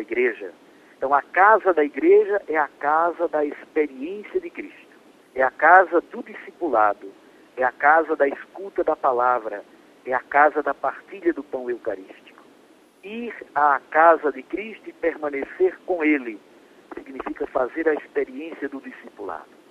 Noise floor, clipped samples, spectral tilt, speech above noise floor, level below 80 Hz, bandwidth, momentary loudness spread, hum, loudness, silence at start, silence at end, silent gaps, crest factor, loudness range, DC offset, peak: -54 dBFS; under 0.1%; -6 dB/octave; 32 dB; -64 dBFS; 7.6 kHz; 20 LU; none; -21 LUFS; 0 s; 0.25 s; none; 22 dB; 6 LU; under 0.1%; 0 dBFS